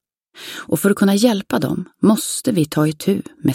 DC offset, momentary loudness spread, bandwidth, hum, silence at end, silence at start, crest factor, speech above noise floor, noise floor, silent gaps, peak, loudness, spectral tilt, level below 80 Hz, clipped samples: under 0.1%; 9 LU; 16.5 kHz; none; 0 s; 0.35 s; 16 dB; 22 dB; -39 dBFS; none; -2 dBFS; -18 LUFS; -5.5 dB/octave; -56 dBFS; under 0.1%